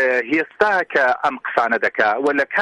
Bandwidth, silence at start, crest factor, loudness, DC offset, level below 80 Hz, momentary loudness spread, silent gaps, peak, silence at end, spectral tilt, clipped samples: 11 kHz; 0 s; 16 dB; -18 LUFS; under 0.1%; -62 dBFS; 4 LU; none; -2 dBFS; 0 s; -4.5 dB/octave; under 0.1%